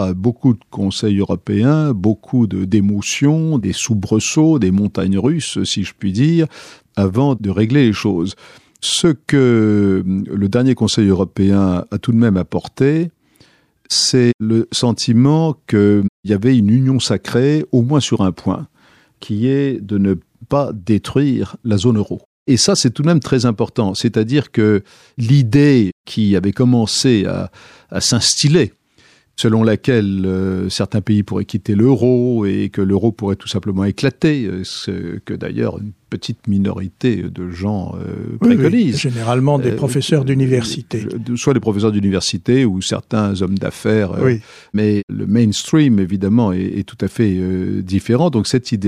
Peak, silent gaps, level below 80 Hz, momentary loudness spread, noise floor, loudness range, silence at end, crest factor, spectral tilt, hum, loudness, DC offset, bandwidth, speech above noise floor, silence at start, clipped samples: -2 dBFS; 14.34-14.39 s, 16.09-16.23 s, 22.25-22.46 s, 25.92-26.04 s, 45.03-45.08 s; -48 dBFS; 9 LU; -52 dBFS; 4 LU; 0 s; 14 dB; -6 dB/octave; none; -16 LUFS; under 0.1%; 13.5 kHz; 37 dB; 0 s; under 0.1%